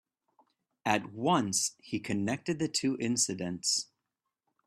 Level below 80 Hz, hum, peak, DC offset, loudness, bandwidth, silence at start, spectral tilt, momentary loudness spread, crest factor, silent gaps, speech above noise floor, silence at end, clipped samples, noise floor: -70 dBFS; none; -10 dBFS; under 0.1%; -31 LUFS; 15 kHz; 0.85 s; -3 dB/octave; 6 LU; 24 dB; none; 55 dB; 0.8 s; under 0.1%; -87 dBFS